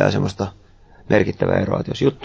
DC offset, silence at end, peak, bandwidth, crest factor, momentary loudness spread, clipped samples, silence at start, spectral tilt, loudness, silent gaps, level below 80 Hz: under 0.1%; 0 s; -2 dBFS; 8 kHz; 18 dB; 8 LU; under 0.1%; 0 s; -7 dB/octave; -20 LUFS; none; -42 dBFS